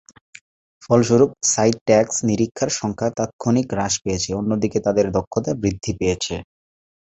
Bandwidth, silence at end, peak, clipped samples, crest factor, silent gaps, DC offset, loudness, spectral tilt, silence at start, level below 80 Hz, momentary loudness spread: 8.2 kHz; 0.6 s; -2 dBFS; under 0.1%; 18 dB; 1.81-1.86 s, 3.33-3.39 s, 5.27-5.31 s; under 0.1%; -20 LUFS; -4.5 dB/octave; 0.8 s; -44 dBFS; 7 LU